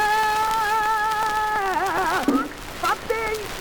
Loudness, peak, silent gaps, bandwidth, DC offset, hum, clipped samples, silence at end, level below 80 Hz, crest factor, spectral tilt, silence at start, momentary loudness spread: -22 LUFS; -8 dBFS; none; over 20 kHz; under 0.1%; none; under 0.1%; 0 s; -44 dBFS; 14 dB; -3 dB/octave; 0 s; 5 LU